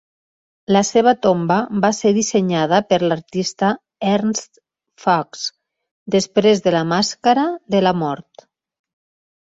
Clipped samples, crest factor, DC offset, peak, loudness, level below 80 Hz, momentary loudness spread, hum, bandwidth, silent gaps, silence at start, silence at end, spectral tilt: under 0.1%; 16 dB; under 0.1%; -2 dBFS; -18 LUFS; -58 dBFS; 9 LU; none; 8 kHz; 5.91-6.06 s; 0.7 s; 1.3 s; -4.5 dB/octave